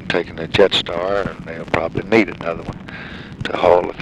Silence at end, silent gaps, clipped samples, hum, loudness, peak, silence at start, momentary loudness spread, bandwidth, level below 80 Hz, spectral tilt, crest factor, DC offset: 0 s; none; under 0.1%; none; -18 LUFS; 0 dBFS; 0 s; 16 LU; 11.5 kHz; -42 dBFS; -5.5 dB/octave; 18 dB; under 0.1%